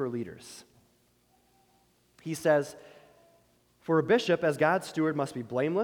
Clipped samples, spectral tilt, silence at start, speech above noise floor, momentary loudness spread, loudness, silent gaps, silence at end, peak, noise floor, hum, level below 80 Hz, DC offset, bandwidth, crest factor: under 0.1%; -5.5 dB/octave; 0 s; 39 dB; 21 LU; -28 LUFS; none; 0 s; -12 dBFS; -68 dBFS; 60 Hz at -70 dBFS; -72 dBFS; under 0.1%; 19 kHz; 18 dB